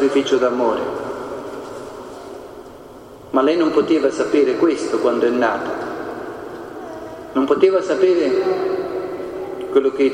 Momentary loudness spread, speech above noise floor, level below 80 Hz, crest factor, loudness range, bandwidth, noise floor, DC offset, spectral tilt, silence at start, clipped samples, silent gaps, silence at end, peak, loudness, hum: 18 LU; 22 dB; -56 dBFS; 18 dB; 5 LU; 11 kHz; -39 dBFS; under 0.1%; -5 dB/octave; 0 s; under 0.1%; none; 0 s; -2 dBFS; -18 LUFS; none